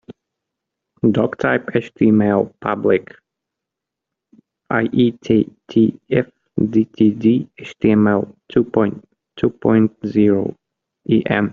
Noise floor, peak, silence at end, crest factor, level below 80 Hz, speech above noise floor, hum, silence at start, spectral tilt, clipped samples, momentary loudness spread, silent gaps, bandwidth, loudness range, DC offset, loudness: -83 dBFS; 0 dBFS; 0 s; 18 dB; -54 dBFS; 67 dB; none; 1.05 s; -7 dB/octave; under 0.1%; 7 LU; none; 6.8 kHz; 3 LU; under 0.1%; -18 LUFS